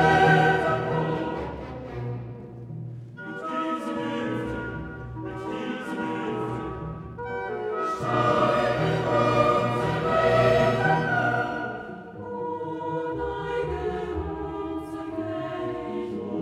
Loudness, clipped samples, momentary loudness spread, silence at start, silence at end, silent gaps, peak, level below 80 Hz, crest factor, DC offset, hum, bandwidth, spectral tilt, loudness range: -26 LUFS; under 0.1%; 15 LU; 0 s; 0 s; none; -8 dBFS; -48 dBFS; 18 dB; under 0.1%; none; 12.5 kHz; -7 dB/octave; 10 LU